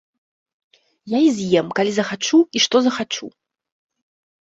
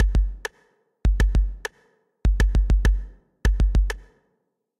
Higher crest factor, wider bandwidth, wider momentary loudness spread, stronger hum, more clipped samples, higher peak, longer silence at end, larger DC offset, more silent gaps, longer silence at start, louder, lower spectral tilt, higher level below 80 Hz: about the same, 18 dB vs 16 dB; second, 8 kHz vs 10.5 kHz; second, 10 LU vs 14 LU; neither; neither; first, -2 dBFS vs -6 dBFS; first, 1.3 s vs 0.8 s; neither; neither; first, 1.05 s vs 0 s; first, -18 LUFS vs -24 LUFS; second, -4 dB/octave vs -6 dB/octave; second, -64 dBFS vs -22 dBFS